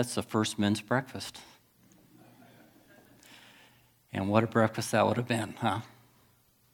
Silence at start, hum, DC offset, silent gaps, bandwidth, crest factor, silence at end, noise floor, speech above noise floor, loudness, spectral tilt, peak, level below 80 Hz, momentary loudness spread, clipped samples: 0 s; none; under 0.1%; none; 19 kHz; 24 dB; 0.85 s; -66 dBFS; 36 dB; -30 LUFS; -5 dB/octave; -8 dBFS; -72 dBFS; 14 LU; under 0.1%